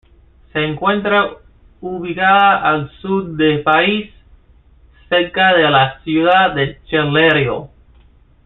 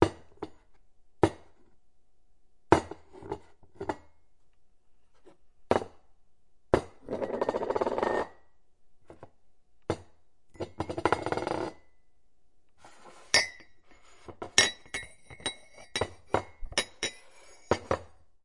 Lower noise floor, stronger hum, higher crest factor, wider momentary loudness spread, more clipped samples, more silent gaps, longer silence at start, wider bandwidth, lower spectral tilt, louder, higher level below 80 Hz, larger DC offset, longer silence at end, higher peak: second, -48 dBFS vs -70 dBFS; neither; second, 16 dB vs 32 dB; second, 12 LU vs 20 LU; neither; neither; first, 0.55 s vs 0 s; second, 4.2 kHz vs 11.5 kHz; first, -8.5 dB/octave vs -3 dB/octave; first, -14 LUFS vs -31 LUFS; first, -46 dBFS vs -56 dBFS; second, under 0.1% vs 0.2%; first, 0.8 s vs 0.4 s; about the same, 0 dBFS vs -2 dBFS